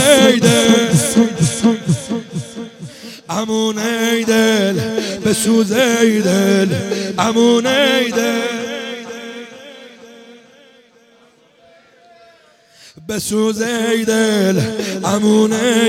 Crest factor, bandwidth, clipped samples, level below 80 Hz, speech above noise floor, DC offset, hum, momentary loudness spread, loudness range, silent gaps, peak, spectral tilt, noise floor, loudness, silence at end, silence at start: 16 dB; 16.5 kHz; under 0.1%; -54 dBFS; 36 dB; under 0.1%; none; 18 LU; 12 LU; none; 0 dBFS; -4 dB/octave; -50 dBFS; -15 LUFS; 0 s; 0 s